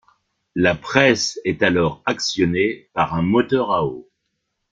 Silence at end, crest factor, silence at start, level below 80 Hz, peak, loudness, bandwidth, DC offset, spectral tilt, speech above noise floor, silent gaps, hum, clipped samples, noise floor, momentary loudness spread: 0.7 s; 20 dB; 0.55 s; -50 dBFS; -2 dBFS; -19 LUFS; 9 kHz; under 0.1%; -4.5 dB/octave; 56 dB; none; none; under 0.1%; -74 dBFS; 6 LU